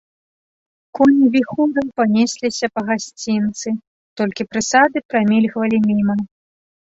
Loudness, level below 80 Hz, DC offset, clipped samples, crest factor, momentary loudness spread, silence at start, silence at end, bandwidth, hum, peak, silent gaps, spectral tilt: -17 LUFS; -58 dBFS; under 0.1%; under 0.1%; 16 dB; 10 LU; 0.95 s; 0.65 s; 8 kHz; none; -2 dBFS; 3.87-4.16 s, 5.05-5.09 s; -5 dB/octave